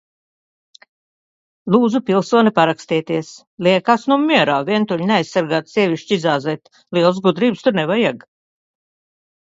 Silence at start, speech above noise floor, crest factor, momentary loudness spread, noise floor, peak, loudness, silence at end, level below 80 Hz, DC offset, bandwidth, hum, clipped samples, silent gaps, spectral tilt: 1.65 s; over 74 dB; 18 dB; 9 LU; under -90 dBFS; 0 dBFS; -17 LUFS; 1.4 s; -64 dBFS; under 0.1%; 7.8 kHz; none; under 0.1%; 3.47-3.57 s; -6 dB/octave